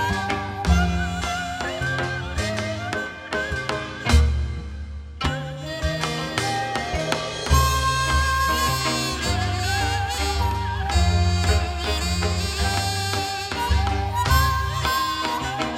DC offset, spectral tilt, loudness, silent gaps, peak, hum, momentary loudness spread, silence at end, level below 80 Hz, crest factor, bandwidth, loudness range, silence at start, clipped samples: under 0.1%; -4 dB/octave; -23 LUFS; none; -4 dBFS; none; 8 LU; 0 s; -28 dBFS; 20 dB; 16 kHz; 4 LU; 0 s; under 0.1%